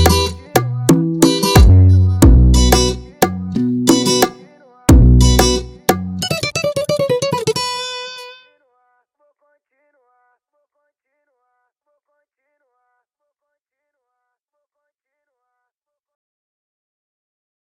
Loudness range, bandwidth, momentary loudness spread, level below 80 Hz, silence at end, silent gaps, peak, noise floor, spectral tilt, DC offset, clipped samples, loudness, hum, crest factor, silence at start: 12 LU; 16.5 kHz; 11 LU; -20 dBFS; 9.5 s; none; 0 dBFS; -81 dBFS; -5.5 dB/octave; under 0.1%; under 0.1%; -14 LUFS; none; 16 dB; 0 s